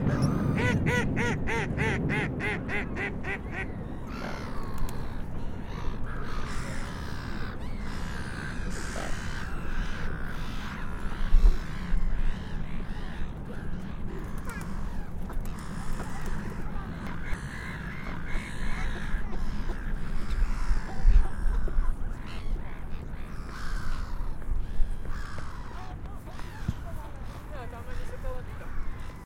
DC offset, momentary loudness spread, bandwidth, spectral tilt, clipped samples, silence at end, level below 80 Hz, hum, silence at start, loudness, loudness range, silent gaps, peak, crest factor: under 0.1%; 13 LU; 11 kHz; -6 dB/octave; under 0.1%; 0 s; -30 dBFS; none; 0 s; -34 LUFS; 8 LU; none; -8 dBFS; 20 dB